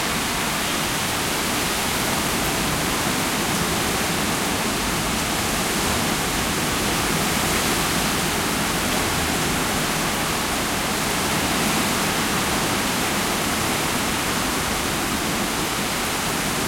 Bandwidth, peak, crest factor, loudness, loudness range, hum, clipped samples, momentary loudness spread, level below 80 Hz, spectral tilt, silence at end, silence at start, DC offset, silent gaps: 16.5 kHz; -8 dBFS; 14 dB; -21 LUFS; 1 LU; none; under 0.1%; 2 LU; -40 dBFS; -2.5 dB/octave; 0 s; 0 s; under 0.1%; none